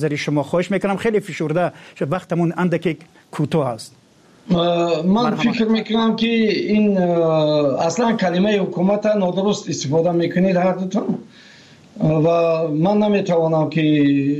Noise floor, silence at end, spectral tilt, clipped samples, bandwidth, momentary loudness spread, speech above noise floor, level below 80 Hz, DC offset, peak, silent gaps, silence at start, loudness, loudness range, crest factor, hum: -46 dBFS; 0 s; -6.5 dB/octave; under 0.1%; 11.5 kHz; 7 LU; 28 dB; -56 dBFS; under 0.1%; -8 dBFS; none; 0 s; -18 LUFS; 4 LU; 10 dB; none